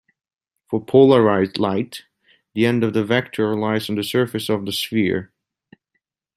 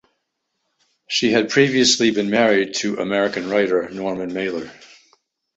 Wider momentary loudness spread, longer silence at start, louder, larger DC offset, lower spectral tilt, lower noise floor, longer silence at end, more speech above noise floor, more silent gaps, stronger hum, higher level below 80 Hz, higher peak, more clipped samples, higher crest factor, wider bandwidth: first, 14 LU vs 11 LU; second, 0.7 s vs 1.1 s; about the same, -19 LUFS vs -18 LUFS; neither; first, -6 dB/octave vs -3.5 dB/octave; about the same, -75 dBFS vs -75 dBFS; first, 1.1 s vs 0.7 s; about the same, 57 dB vs 56 dB; neither; neither; about the same, -62 dBFS vs -60 dBFS; about the same, -2 dBFS vs -4 dBFS; neither; about the same, 18 dB vs 18 dB; first, 15.5 kHz vs 8.2 kHz